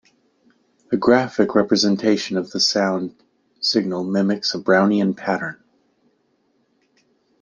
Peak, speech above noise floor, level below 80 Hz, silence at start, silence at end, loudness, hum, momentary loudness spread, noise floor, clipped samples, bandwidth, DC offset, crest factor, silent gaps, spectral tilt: -2 dBFS; 46 dB; -64 dBFS; 0.9 s; 1.85 s; -19 LUFS; none; 8 LU; -65 dBFS; under 0.1%; 9.8 kHz; under 0.1%; 20 dB; none; -4.5 dB/octave